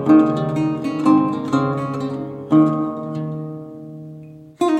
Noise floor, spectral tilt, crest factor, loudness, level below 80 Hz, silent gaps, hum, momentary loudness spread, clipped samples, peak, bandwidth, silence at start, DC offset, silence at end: -39 dBFS; -8.5 dB/octave; 16 dB; -19 LUFS; -58 dBFS; none; none; 20 LU; under 0.1%; -2 dBFS; 9 kHz; 0 s; under 0.1%; 0 s